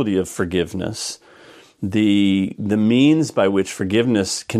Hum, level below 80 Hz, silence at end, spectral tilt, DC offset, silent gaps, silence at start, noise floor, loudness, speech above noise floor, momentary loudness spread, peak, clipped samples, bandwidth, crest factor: none; -52 dBFS; 0 s; -5.5 dB/octave; under 0.1%; none; 0 s; -46 dBFS; -19 LUFS; 28 dB; 11 LU; -4 dBFS; under 0.1%; 14 kHz; 16 dB